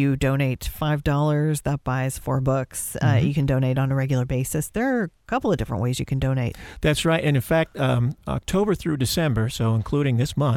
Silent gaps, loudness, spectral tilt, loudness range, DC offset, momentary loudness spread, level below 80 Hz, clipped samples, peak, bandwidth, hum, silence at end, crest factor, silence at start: none; -23 LUFS; -6 dB/octave; 1 LU; under 0.1%; 5 LU; -40 dBFS; under 0.1%; -6 dBFS; 16.5 kHz; none; 0 s; 16 dB; 0 s